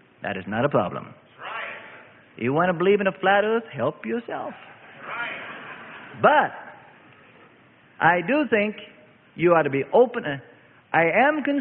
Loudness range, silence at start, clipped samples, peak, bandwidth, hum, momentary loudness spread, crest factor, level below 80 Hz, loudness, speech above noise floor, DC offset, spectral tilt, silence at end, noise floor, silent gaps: 4 LU; 0.2 s; under 0.1%; -4 dBFS; 4.2 kHz; none; 20 LU; 20 dB; -64 dBFS; -22 LUFS; 33 dB; under 0.1%; -10.5 dB/octave; 0 s; -54 dBFS; none